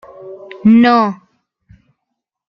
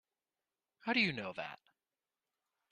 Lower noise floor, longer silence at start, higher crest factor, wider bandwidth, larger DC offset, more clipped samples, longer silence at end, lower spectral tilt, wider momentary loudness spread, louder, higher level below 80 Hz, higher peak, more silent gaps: second, -76 dBFS vs under -90 dBFS; second, 0.2 s vs 0.85 s; second, 14 dB vs 22 dB; second, 6 kHz vs 10 kHz; neither; neither; first, 1.35 s vs 1.15 s; first, -8 dB/octave vs -5.5 dB/octave; first, 25 LU vs 14 LU; first, -11 LUFS vs -36 LUFS; first, -58 dBFS vs -80 dBFS; first, -2 dBFS vs -20 dBFS; neither